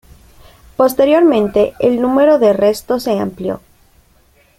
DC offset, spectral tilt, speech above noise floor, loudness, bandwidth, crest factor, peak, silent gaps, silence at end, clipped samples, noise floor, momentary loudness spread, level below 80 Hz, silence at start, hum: under 0.1%; -6 dB/octave; 39 dB; -13 LUFS; 16.5 kHz; 14 dB; -2 dBFS; none; 1 s; under 0.1%; -52 dBFS; 13 LU; -46 dBFS; 0.8 s; none